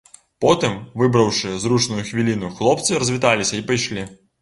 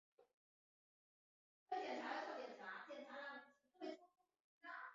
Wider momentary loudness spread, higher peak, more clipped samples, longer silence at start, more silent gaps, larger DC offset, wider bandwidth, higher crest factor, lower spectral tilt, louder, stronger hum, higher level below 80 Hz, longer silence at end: second, 5 LU vs 10 LU; first, -2 dBFS vs -34 dBFS; neither; first, 0.4 s vs 0.2 s; second, none vs 0.34-1.66 s, 4.40-4.61 s; neither; first, 11.5 kHz vs 7.4 kHz; about the same, 18 dB vs 20 dB; first, -4.5 dB/octave vs 0 dB/octave; first, -19 LUFS vs -52 LUFS; neither; first, -50 dBFS vs under -90 dBFS; first, 0.25 s vs 0 s